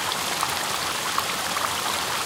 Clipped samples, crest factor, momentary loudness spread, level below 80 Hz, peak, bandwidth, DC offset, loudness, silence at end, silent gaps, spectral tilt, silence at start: under 0.1%; 18 dB; 1 LU; -58 dBFS; -8 dBFS; 18 kHz; under 0.1%; -24 LUFS; 0 s; none; -0.5 dB/octave; 0 s